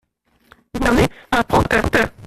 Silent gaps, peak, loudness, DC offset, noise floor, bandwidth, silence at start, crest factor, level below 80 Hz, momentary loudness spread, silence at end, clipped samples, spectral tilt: none; -2 dBFS; -17 LUFS; under 0.1%; -60 dBFS; 15 kHz; 0.75 s; 16 dB; -32 dBFS; 5 LU; 0 s; under 0.1%; -5.5 dB/octave